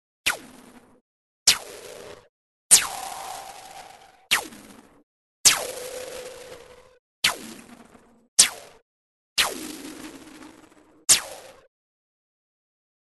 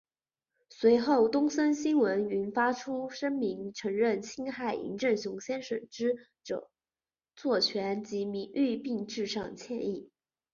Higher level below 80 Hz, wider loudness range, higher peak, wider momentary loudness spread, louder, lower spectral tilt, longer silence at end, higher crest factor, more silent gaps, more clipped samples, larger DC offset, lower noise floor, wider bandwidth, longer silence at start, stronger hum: first, -60 dBFS vs -72 dBFS; about the same, 3 LU vs 5 LU; first, 0 dBFS vs -12 dBFS; first, 25 LU vs 12 LU; first, -21 LUFS vs -31 LUFS; second, 1.5 dB/octave vs -4.5 dB/octave; first, 1.5 s vs 0.5 s; first, 28 dB vs 18 dB; first, 1.01-1.46 s, 2.29-2.70 s, 5.03-5.44 s, 6.99-7.22 s, 8.28-8.37 s, 8.82-9.36 s vs none; neither; neither; second, -53 dBFS vs under -90 dBFS; first, 12.5 kHz vs 7.4 kHz; second, 0.25 s vs 0.7 s; neither